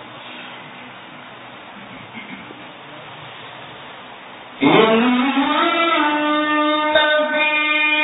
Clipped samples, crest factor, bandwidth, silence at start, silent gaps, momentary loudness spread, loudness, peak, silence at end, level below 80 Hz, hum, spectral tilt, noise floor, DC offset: under 0.1%; 18 dB; 4 kHz; 0 s; none; 22 LU; -16 LUFS; -2 dBFS; 0 s; -62 dBFS; none; -9.5 dB/octave; -37 dBFS; under 0.1%